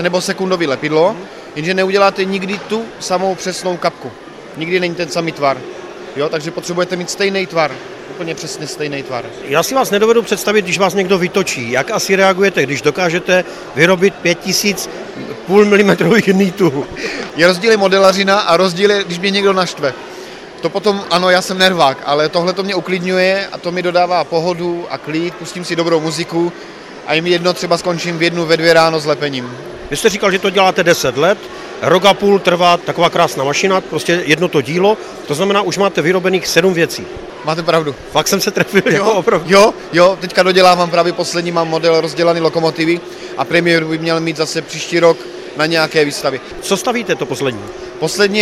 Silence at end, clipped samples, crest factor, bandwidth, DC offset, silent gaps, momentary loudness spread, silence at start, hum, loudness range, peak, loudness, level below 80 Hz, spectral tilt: 0 s; under 0.1%; 14 dB; 15.5 kHz; under 0.1%; none; 12 LU; 0 s; none; 6 LU; 0 dBFS; -14 LUFS; -50 dBFS; -4 dB/octave